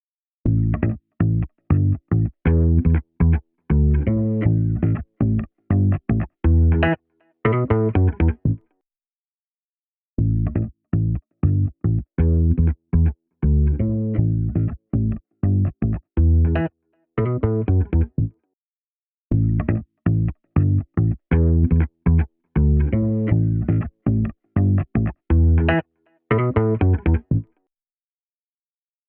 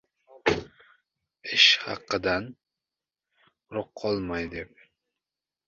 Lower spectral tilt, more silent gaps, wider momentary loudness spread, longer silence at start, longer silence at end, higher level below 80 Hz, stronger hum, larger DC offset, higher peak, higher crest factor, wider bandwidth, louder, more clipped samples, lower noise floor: first, -9.5 dB/octave vs -3 dB/octave; first, 9.15-10.17 s, 18.53-19.30 s vs none; second, 7 LU vs 21 LU; about the same, 0.45 s vs 0.45 s; first, 1.65 s vs 1 s; first, -26 dBFS vs -56 dBFS; neither; neither; about the same, -4 dBFS vs -4 dBFS; second, 16 dB vs 26 dB; second, 3.3 kHz vs 8 kHz; first, -21 LUFS vs -25 LUFS; neither; about the same, under -90 dBFS vs -90 dBFS